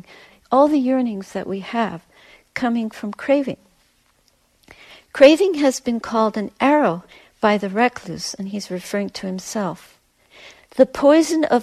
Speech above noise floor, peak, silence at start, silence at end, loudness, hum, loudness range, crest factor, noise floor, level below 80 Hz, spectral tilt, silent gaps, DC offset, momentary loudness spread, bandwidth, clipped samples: 43 dB; 0 dBFS; 0.5 s; 0 s; -19 LUFS; none; 8 LU; 20 dB; -61 dBFS; -58 dBFS; -5 dB/octave; none; under 0.1%; 15 LU; 14 kHz; under 0.1%